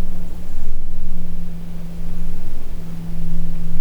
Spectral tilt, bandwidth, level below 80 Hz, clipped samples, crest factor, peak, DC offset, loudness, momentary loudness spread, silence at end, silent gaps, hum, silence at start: -7.5 dB/octave; 1 kHz; -18 dBFS; under 0.1%; 8 dB; -4 dBFS; under 0.1%; -31 LUFS; 5 LU; 0 s; none; none; 0 s